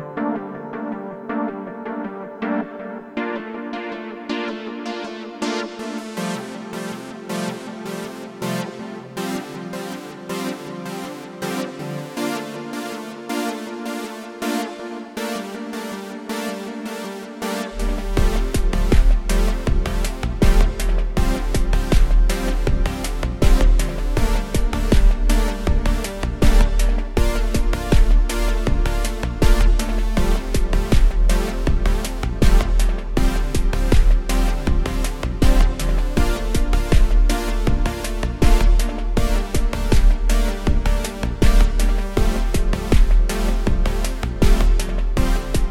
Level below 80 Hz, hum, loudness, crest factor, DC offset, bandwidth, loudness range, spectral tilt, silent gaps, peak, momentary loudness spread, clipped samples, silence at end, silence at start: -18 dBFS; none; -23 LUFS; 16 dB; under 0.1%; 15 kHz; 7 LU; -5.5 dB/octave; none; -2 dBFS; 11 LU; under 0.1%; 0 s; 0 s